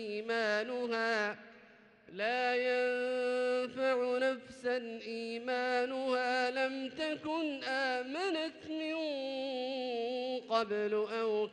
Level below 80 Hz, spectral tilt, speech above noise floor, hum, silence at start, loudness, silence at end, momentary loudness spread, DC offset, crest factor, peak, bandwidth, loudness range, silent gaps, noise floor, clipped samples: -80 dBFS; -3.5 dB/octave; 26 dB; none; 0 s; -35 LUFS; 0 s; 6 LU; under 0.1%; 16 dB; -18 dBFS; 10 kHz; 3 LU; none; -61 dBFS; under 0.1%